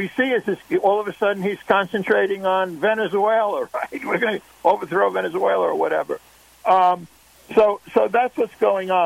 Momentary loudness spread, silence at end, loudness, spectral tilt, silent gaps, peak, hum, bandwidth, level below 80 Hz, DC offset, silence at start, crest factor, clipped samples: 7 LU; 0 s; -20 LUFS; -5.5 dB/octave; none; -2 dBFS; none; 16 kHz; -62 dBFS; under 0.1%; 0 s; 18 dB; under 0.1%